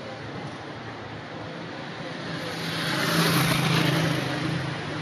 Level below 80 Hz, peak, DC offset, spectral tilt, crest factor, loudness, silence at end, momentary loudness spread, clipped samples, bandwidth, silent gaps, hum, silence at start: -58 dBFS; -10 dBFS; under 0.1%; -4.5 dB/octave; 18 dB; -27 LUFS; 0 s; 15 LU; under 0.1%; 13 kHz; none; none; 0 s